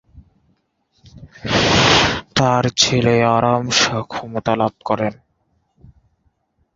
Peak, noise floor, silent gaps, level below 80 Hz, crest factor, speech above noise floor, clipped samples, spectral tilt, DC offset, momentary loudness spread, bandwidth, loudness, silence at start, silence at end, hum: 0 dBFS; -65 dBFS; none; -42 dBFS; 18 dB; 48 dB; under 0.1%; -3.5 dB/octave; under 0.1%; 11 LU; 7.8 kHz; -16 LUFS; 0.15 s; 1.65 s; none